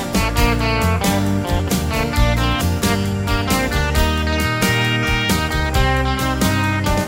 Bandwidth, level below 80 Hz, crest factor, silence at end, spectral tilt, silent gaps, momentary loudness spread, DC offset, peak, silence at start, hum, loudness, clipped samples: 16.5 kHz; -24 dBFS; 14 dB; 0 s; -4.5 dB/octave; none; 3 LU; under 0.1%; -2 dBFS; 0 s; none; -18 LUFS; under 0.1%